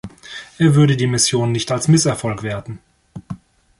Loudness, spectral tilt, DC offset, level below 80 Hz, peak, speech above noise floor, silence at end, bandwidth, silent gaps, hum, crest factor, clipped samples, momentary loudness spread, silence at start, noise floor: -16 LUFS; -5 dB/octave; under 0.1%; -48 dBFS; -2 dBFS; 21 dB; 0.45 s; 11.5 kHz; none; none; 16 dB; under 0.1%; 21 LU; 0.05 s; -37 dBFS